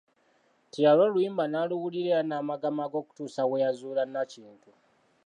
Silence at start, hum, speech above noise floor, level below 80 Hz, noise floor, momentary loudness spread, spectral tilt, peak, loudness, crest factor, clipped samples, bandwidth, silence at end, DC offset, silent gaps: 0.75 s; none; 40 dB; -86 dBFS; -67 dBFS; 13 LU; -6.5 dB/octave; -10 dBFS; -28 LUFS; 18 dB; under 0.1%; 9.8 kHz; 0.75 s; under 0.1%; none